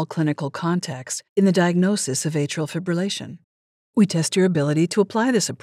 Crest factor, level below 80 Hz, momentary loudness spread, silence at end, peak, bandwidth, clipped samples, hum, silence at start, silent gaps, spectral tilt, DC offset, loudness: 14 dB; -78 dBFS; 8 LU; 0.1 s; -6 dBFS; 14 kHz; under 0.1%; none; 0 s; 1.29-1.36 s, 3.44-3.93 s; -5 dB/octave; under 0.1%; -21 LUFS